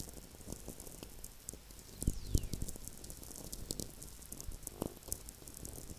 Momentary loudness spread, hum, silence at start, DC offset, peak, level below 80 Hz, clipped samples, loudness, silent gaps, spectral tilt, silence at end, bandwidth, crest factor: 10 LU; none; 0 s; under 0.1%; -16 dBFS; -48 dBFS; under 0.1%; -45 LUFS; none; -4 dB/octave; 0 s; 16 kHz; 28 dB